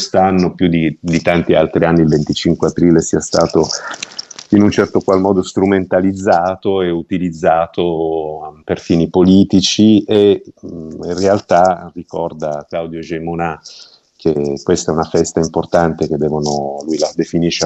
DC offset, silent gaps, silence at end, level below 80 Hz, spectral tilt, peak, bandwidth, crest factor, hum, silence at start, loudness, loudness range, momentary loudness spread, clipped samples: under 0.1%; none; 0 s; -42 dBFS; -5.5 dB/octave; 0 dBFS; 8.4 kHz; 14 dB; none; 0 s; -14 LUFS; 5 LU; 12 LU; under 0.1%